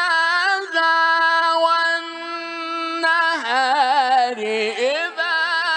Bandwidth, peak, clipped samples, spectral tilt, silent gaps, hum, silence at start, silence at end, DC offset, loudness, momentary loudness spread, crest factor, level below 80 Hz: 10 kHz; -4 dBFS; under 0.1%; -1 dB/octave; none; none; 0 s; 0 s; under 0.1%; -18 LUFS; 9 LU; 16 dB; -84 dBFS